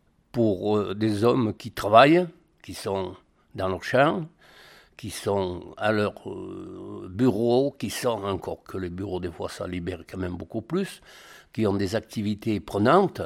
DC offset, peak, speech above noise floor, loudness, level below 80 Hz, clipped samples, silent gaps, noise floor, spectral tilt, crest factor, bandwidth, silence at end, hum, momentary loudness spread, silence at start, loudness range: under 0.1%; -2 dBFS; 27 dB; -25 LUFS; -56 dBFS; under 0.1%; none; -52 dBFS; -6 dB/octave; 24 dB; 16.5 kHz; 0 s; none; 17 LU; 0.35 s; 8 LU